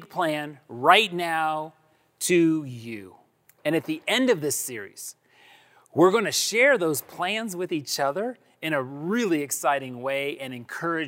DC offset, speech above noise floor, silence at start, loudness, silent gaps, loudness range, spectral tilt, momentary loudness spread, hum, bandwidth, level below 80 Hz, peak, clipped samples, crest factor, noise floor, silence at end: under 0.1%; 31 dB; 0 s; -24 LUFS; none; 4 LU; -3.5 dB/octave; 16 LU; none; 16 kHz; -78 dBFS; -4 dBFS; under 0.1%; 22 dB; -56 dBFS; 0 s